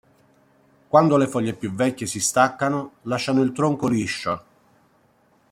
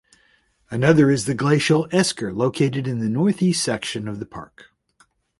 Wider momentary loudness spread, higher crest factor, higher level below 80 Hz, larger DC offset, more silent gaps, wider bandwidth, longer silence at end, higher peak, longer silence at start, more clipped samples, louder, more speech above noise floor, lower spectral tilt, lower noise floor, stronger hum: second, 9 LU vs 15 LU; about the same, 22 dB vs 20 dB; second, -62 dBFS vs -54 dBFS; neither; neither; first, 16 kHz vs 11.5 kHz; first, 1.1 s vs 0.95 s; about the same, -2 dBFS vs -2 dBFS; first, 0.95 s vs 0.7 s; neither; about the same, -22 LUFS vs -20 LUFS; about the same, 39 dB vs 41 dB; about the same, -5 dB/octave vs -5.5 dB/octave; about the same, -60 dBFS vs -61 dBFS; neither